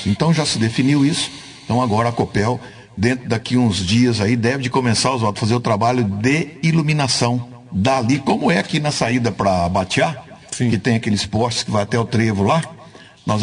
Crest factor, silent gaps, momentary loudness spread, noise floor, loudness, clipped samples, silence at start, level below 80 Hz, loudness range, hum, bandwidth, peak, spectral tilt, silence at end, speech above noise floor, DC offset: 14 dB; none; 6 LU; -42 dBFS; -18 LUFS; under 0.1%; 0 s; -50 dBFS; 2 LU; none; 10.5 kHz; -4 dBFS; -5.5 dB/octave; 0 s; 25 dB; under 0.1%